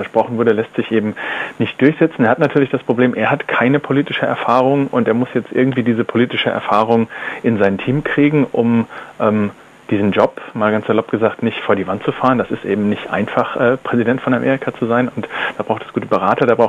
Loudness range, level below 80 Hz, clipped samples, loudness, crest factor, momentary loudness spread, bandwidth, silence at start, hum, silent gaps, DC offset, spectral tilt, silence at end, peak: 2 LU; -54 dBFS; under 0.1%; -16 LUFS; 16 dB; 6 LU; 9.2 kHz; 0 s; none; none; under 0.1%; -8 dB/octave; 0 s; 0 dBFS